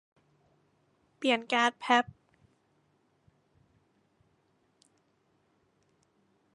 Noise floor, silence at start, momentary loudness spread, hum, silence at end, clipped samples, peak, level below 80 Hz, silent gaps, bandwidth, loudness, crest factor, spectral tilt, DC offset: -72 dBFS; 1.2 s; 7 LU; none; 4.55 s; under 0.1%; -8 dBFS; -78 dBFS; none; 11 kHz; -28 LUFS; 28 dB; -2.5 dB/octave; under 0.1%